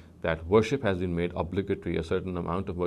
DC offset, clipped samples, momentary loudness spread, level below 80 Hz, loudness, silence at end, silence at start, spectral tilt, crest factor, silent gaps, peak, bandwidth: under 0.1%; under 0.1%; 7 LU; -44 dBFS; -29 LUFS; 0 s; 0 s; -7 dB/octave; 18 dB; none; -10 dBFS; 11 kHz